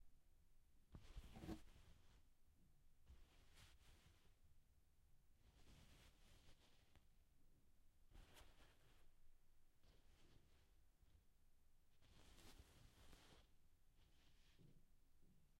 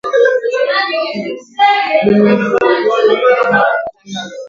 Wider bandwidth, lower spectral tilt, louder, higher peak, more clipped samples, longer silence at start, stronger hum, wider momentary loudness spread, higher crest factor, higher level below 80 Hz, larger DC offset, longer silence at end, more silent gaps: first, 16 kHz vs 7.4 kHz; about the same, -5 dB/octave vs -5.5 dB/octave; second, -63 LUFS vs -12 LUFS; second, -40 dBFS vs 0 dBFS; neither; about the same, 0 s vs 0.05 s; neither; about the same, 11 LU vs 12 LU; first, 26 dB vs 12 dB; second, -72 dBFS vs -54 dBFS; neither; about the same, 0 s vs 0 s; neither